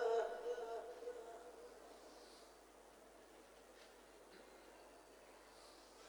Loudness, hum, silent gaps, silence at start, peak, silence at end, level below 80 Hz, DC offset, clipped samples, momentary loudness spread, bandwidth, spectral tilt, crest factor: -51 LUFS; none; none; 0 s; -30 dBFS; 0 s; -80 dBFS; under 0.1%; under 0.1%; 17 LU; 19 kHz; -2.5 dB/octave; 20 dB